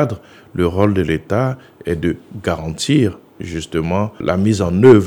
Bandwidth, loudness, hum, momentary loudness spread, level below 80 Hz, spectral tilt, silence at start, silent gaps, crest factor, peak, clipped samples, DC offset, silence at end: 19 kHz; -18 LUFS; none; 12 LU; -40 dBFS; -6.5 dB/octave; 0 s; none; 16 dB; 0 dBFS; under 0.1%; under 0.1%; 0 s